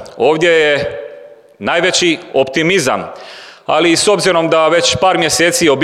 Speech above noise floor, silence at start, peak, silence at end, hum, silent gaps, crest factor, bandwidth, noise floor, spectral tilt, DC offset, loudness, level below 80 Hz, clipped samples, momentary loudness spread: 24 dB; 0 s; 0 dBFS; 0 s; none; none; 12 dB; 15.5 kHz; -36 dBFS; -3 dB/octave; under 0.1%; -12 LUFS; -50 dBFS; under 0.1%; 17 LU